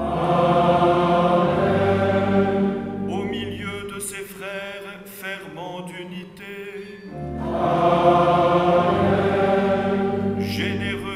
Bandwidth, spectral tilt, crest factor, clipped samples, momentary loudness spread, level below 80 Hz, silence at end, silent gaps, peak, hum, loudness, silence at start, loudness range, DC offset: 15.5 kHz; -6.5 dB/octave; 18 dB; under 0.1%; 17 LU; -46 dBFS; 0 s; none; -4 dBFS; none; -20 LUFS; 0 s; 13 LU; under 0.1%